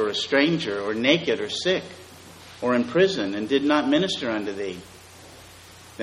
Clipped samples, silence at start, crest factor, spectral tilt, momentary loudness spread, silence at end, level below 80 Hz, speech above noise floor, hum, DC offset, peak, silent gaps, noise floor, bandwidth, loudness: under 0.1%; 0 s; 20 dB; -4.5 dB/octave; 21 LU; 0 s; -62 dBFS; 23 dB; none; under 0.1%; -4 dBFS; none; -46 dBFS; 14 kHz; -23 LUFS